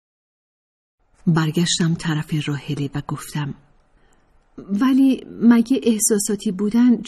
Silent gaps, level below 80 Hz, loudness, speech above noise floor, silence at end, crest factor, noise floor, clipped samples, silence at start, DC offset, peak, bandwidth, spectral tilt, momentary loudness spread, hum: none; -52 dBFS; -19 LUFS; 38 dB; 0 s; 16 dB; -56 dBFS; under 0.1%; 1.25 s; under 0.1%; -4 dBFS; 13 kHz; -5 dB/octave; 11 LU; none